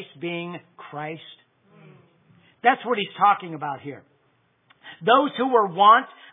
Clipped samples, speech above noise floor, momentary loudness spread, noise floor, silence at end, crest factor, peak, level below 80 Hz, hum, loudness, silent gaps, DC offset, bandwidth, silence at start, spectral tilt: under 0.1%; 44 dB; 20 LU; -65 dBFS; 0.25 s; 22 dB; -2 dBFS; -86 dBFS; none; -21 LUFS; none; under 0.1%; 3.9 kHz; 0 s; -8.5 dB/octave